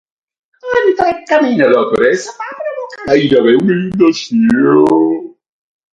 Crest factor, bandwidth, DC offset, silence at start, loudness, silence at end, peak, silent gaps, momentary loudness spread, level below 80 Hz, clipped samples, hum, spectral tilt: 12 dB; 9.4 kHz; under 0.1%; 0.65 s; -12 LUFS; 0.65 s; 0 dBFS; none; 13 LU; -50 dBFS; under 0.1%; none; -6 dB/octave